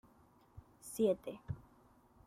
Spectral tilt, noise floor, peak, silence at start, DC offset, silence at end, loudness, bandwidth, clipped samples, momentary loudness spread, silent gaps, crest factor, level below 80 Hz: -6.5 dB/octave; -67 dBFS; -22 dBFS; 0.55 s; under 0.1%; 0.65 s; -39 LUFS; 15.5 kHz; under 0.1%; 26 LU; none; 20 dB; -66 dBFS